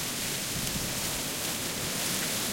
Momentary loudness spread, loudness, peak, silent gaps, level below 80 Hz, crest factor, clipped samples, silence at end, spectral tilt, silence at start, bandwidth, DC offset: 2 LU; -30 LUFS; -16 dBFS; none; -50 dBFS; 16 dB; under 0.1%; 0 s; -2 dB/octave; 0 s; 16.5 kHz; under 0.1%